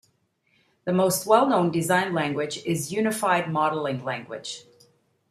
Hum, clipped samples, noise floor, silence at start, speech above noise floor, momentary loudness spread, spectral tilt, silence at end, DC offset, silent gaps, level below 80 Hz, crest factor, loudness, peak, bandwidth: none; under 0.1%; -68 dBFS; 0.85 s; 45 dB; 15 LU; -4.5 dB/octave; 0.7 s; under 0.1%; none; -68 dBFS; 22 dB; -24 LUFS; -4 dBFS; 15 kHz